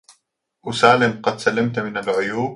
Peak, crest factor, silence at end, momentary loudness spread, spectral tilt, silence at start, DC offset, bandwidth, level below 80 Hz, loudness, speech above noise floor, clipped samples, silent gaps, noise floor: 0 dBFS; 20 dB; 0 s; 11 LU; -5 dB/octave; 0.65 s; under 0.1%; 11.5 kHz; -58 dBFS; -19 LUFS; 49 dB; under 0.1%; none; -67 dBFS